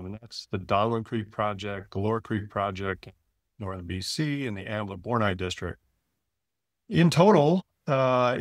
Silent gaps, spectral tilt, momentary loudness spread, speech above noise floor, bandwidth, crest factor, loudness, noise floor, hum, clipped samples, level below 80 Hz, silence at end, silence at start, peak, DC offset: none; -6.5 dB/octave; 15 LU; 60 dB; 14 kHz; 22 dB; -27 LUFS; -86 dBFS; none; under 0.1%; -58 dBFS; 0 s; 0 s; -6 dBFS; under 0.1%